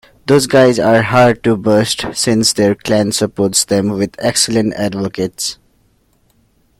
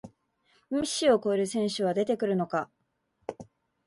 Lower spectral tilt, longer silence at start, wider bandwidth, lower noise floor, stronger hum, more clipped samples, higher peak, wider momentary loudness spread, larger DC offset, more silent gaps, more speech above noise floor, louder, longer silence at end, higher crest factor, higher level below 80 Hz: about the same, -4 dB/octave vs -4.5 dB/octave; first, 0.25 s vs 0.05 s; first, 16.5 kHz vs 11.5 kHz; second, -56 dBFS vs -74 dBFS; neither; neither; first, 0 dBFS vs -12 dBFS; second, 9 LU vs 18 LU; neither; neither; second, 43 dB vs 47 dB; first, -13 LUFS vs -28 LUFS; first, 1.25 s vs 0.45 s; about the same, 14 dB vs 18 dB; first, -46 dBFS vs -68 dBFS